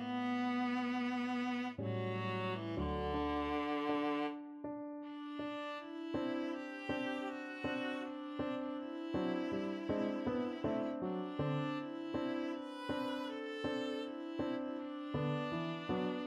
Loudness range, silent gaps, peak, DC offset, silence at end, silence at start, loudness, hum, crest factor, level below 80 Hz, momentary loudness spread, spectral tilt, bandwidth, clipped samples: 3 LU; none; -24 dBFS; under 0.1%; 0 s; 0 s; -40 LUFS; none; 14 dB; -60 dBFS; 7 LU; -7 dB/octave; 11.5 kHz; under 0.1%